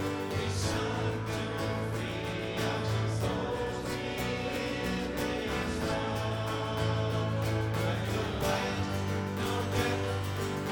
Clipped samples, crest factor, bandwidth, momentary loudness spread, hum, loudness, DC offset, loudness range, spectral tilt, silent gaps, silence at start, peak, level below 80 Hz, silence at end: under 0.1%; 16 dB; over 20 kHz; 3 LU; none; -32 LUFS; under 0.1%; 1 LU; -5.5 dB/octave; none; 0 s; -16 dBFS; -48 dBFS; 0 s